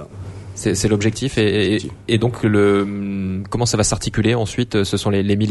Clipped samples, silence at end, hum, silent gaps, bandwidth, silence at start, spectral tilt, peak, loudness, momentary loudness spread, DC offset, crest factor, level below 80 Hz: under 0.1%; 0 s; none; none; 12 kHz; 0 s; -5 dB/octave; -4 dBFS; -18 LUFS; 8 LU; under 0.1%; 16 dB; -40 dBFS